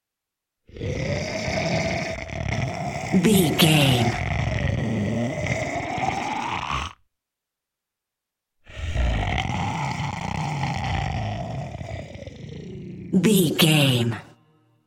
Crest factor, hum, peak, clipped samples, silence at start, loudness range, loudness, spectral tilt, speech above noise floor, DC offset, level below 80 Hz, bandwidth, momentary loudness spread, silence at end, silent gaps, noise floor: 22 dB; none; -2 dBFS; under 0.1%; 0.75 s; 9 LU; -23 LUFS; -5 dB/octave; 67 dB; under 0.1%; -38 dBFS; 17 kHz; 18 LU; 0.6 s; none; -85 dBFS